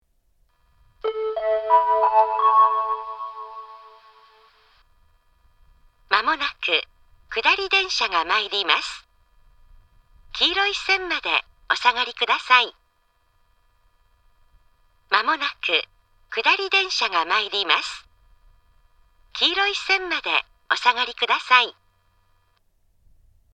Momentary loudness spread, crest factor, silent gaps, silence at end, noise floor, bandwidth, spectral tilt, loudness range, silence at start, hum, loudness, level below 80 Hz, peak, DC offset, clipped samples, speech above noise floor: 13 LU; 24 dB; none; 1.85 s; -65 dBFS; 9.2 kHz; 0 dB/octave; 6 LU; 1.05 s; none; -20 LUFS; -58 dBFS; 0 dBFS; under 0.1%; under 0.1%; 44 dB